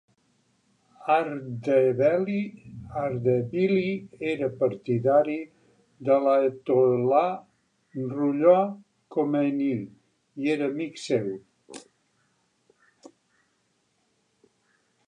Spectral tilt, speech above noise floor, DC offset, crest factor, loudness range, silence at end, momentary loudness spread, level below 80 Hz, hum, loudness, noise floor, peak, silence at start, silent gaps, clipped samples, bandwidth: -7.5 dB/octave; 47 dB; under 0.1%; 20 dB; 9 LU; 3.3 s; 19 LU; -68 dBFS; none; -25 LUFS; -71 dBFS; -6 dBFS; 1 s; none; under 0.1%; 10 kHz